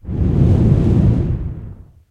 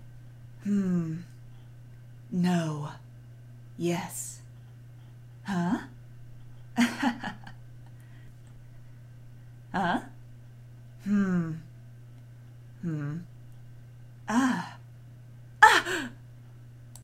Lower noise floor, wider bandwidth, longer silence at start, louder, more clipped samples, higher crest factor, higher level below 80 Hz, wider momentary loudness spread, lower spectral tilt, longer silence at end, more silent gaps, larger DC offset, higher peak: second, -35 dBFS vs -48 dBFS; second, 5.2 kHz vs 16 kHz; about the same, 0.05 s vs 0 s; first, -15 LUFS vs -28 LUFS; neither; second, 14 dB vs 30 dB; first, -22 dBFS vs -58 dBFS; second, 13 LU vs 23 LU; first, -10.5 dB/octave vs -5 dB/octave; first, 0.35 s vs 0 s; neither; neither; about the same, -2 dBFS vs -2 dBFS